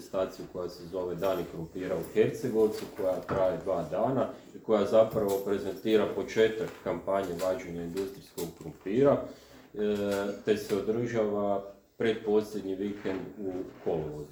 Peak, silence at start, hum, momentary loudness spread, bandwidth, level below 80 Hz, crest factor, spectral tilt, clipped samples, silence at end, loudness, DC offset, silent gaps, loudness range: -10 dBFS; 0 s; none; 11 LU; over 20 kHz; -60 dBFS; 20 dB; -6 dB/octave; under 0.1%; 0 s; -31 LUFS; under 0.1%; none; 3 LU